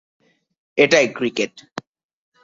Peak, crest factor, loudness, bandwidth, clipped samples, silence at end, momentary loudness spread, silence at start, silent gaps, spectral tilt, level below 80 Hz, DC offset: -2 dBFS; 20 dB; -18 LUFS; 7.8 kHz; under 0.1%; 0.65 s; 21 LU; 0.75 s; 1.72-1.76 s; -3.5 dB/octave; -64 dBFS; under 0.1%